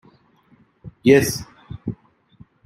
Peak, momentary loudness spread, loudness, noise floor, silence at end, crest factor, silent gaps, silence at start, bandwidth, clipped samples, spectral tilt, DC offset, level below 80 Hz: -2 dBFS; 22 LU; -19 LUFS; -57 dBFS; 0.7 s; 22 dB; none; 0.85 s; 16 kHz; under 0.1%; -5 dB/octave; under 0.1%; -50 dBFS